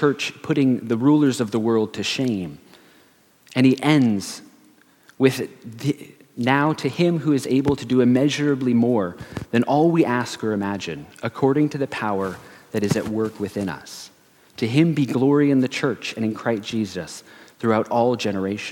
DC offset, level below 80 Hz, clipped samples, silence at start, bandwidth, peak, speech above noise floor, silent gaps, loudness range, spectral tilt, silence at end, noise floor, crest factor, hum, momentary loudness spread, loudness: under 0.1%; -58 dBFS; under 0.1%; 0 s; 17 kHz; -2 dBFS; 35 dB; none; 4 LU; -6 dB/octave; 0 s; -56 dBFS; 20 dB; none; 12 LU; -21 LUFS